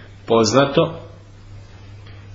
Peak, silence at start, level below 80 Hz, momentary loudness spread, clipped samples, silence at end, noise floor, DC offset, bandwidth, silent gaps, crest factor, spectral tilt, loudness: -2 dBFS; 0 s; -46 dBFS; 25 LU; under 0.1%; 0 s; -40 dBFS; under 0.1%; 7.8 kHz; none; 20 dB; -5 dB/octave; -17 LUFS